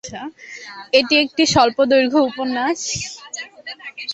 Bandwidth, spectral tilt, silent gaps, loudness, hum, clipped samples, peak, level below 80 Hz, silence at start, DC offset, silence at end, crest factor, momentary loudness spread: 8.4 kHz; -3 dB/octave; none; -17 LUFS; none; under 0.1%; -2 dBFS; -52 dBFS; 0.05 s; under 0.1%; 0 s; 18 dB; 18 LU